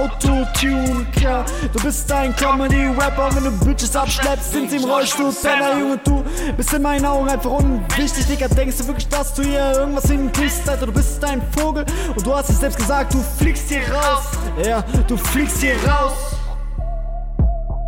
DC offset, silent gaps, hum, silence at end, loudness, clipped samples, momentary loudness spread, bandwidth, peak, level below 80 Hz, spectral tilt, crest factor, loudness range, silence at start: under 0.1%; none; none; 0 s; -19 LUFS; under 0.1%; 5 LU; 17 kHz; -6 dBFS; -22 dBFS; -4.5 dB/octave; 12 dB; 2 LU; 0 s